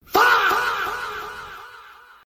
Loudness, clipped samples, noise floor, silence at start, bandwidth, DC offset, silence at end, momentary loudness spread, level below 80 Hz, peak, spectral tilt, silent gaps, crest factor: -19 LUFS; under 0.1%; -46 dBFS; 0.1 s; 16.5 kHz; under 0.1%; 0.35 s; 23 LU; -54 dBFS; -6 dBFS; -1.5 dB/octave; none; 18 dB